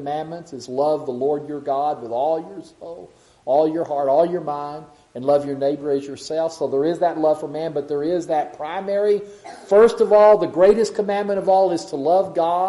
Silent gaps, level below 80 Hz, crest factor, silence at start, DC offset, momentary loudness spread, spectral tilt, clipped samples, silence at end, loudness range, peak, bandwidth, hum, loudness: none; -58 dBFS; 18 dB; 0 s; under 0.1%; 18 LU; -6 dB/octave; under 0.1%; 0 s; 6 LU; -2 dBFS; 11.5 kHz; none; -20 LUFS